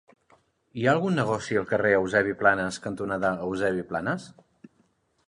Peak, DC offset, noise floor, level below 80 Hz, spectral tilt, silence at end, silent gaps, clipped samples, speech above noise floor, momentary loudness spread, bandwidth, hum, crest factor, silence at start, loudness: -6 dBFS; under 0.1%; -68 dBFS; -58 dBFS; -6 dB/octave; 1 s; none; under 0.1%; 42 dB; 9 LU; 11 kHz; none; 20 dB; 0.75 s; -26 LUFS